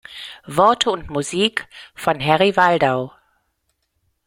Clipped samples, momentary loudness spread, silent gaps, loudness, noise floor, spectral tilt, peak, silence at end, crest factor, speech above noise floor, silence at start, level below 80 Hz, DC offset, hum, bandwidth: under 0.1%; 18 LU; none; -18 LUFS; -70 dBFS; -4 dB/octave; 0 dBFS; 1.15 s; 20 dB; 52 dB; 0.1 s; -52 dBFS; under 0.1%; none; 16.5 kHz